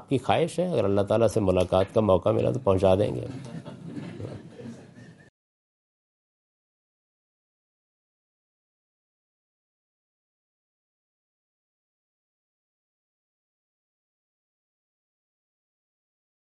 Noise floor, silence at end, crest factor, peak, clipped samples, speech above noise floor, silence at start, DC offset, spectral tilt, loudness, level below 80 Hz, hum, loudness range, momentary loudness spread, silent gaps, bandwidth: -49 dBFS; 11.45 s; 24 dB; -6 dBFS; under 0.1%; 26 dB; 0 s; under 0.1%; -7 dB/octave; -24 LUFS; -62 dBFS; none; 20 LU; 18 LU; none; 11.5 kHz